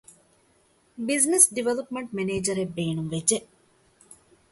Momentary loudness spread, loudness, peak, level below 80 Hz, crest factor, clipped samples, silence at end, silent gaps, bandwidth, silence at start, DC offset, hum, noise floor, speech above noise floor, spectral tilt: 13 LU; -24 LUFS; -2 dBFS; -62 dBFS; 26 dB; under 0.1%; 0.35 s; none; 12 kHz; 1 s; under 0.1%; none; -63 dBFS; 38 dB; -3.5 dB/octave